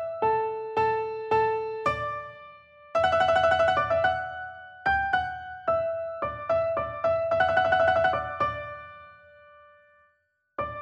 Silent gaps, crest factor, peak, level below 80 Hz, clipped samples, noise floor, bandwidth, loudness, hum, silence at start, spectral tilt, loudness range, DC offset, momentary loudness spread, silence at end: none; 16 dB; -10 dBFS; -54 dBFS; under 0.1%; -72 dBFS; 8.2 kHz; -26 LUFS; none; 0 s; -5 dB/octave; 3 LU; under 0.1%; 14 LU; 0 s